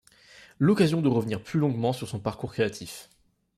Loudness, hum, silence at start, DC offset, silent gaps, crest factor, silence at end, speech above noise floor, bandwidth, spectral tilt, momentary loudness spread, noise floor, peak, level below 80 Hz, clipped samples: -26 LUFS; none; 0.6 s; under 0.1%; none; 18 dB; 0.55 s; 28 dB; 15 kHz; -7 dB/octave; 13 LU; -54 dBFS; -8 dBFS; -60 dBFS; under 0.1%